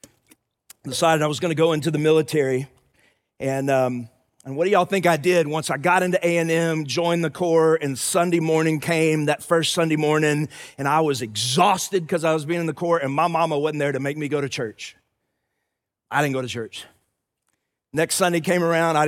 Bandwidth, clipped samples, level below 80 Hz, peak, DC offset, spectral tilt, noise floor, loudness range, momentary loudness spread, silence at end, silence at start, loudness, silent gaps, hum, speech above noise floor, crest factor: 16.5 kHz; under 0.1%; -68 dBFS; -4 dBFS; under 0.1%; -4.5 dB/octave; -80 dBFS; 6 LU; 9 LU; 0 s; 0.85 s; -21 LUFS; none; none; 59 dB; 18 dB